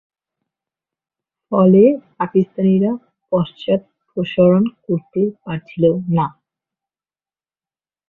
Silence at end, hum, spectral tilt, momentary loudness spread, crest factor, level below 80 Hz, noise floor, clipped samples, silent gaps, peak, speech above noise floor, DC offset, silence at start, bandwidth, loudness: 1.8 s; none; -11 dB/octave; 13 LU; 16 dB; -56 dBFS; under -90 dBFS; under 0.1%; none; -2 dBFS; over 74 dB; under 0.1%; 1.5 s; 4 kHz; -17 LUFS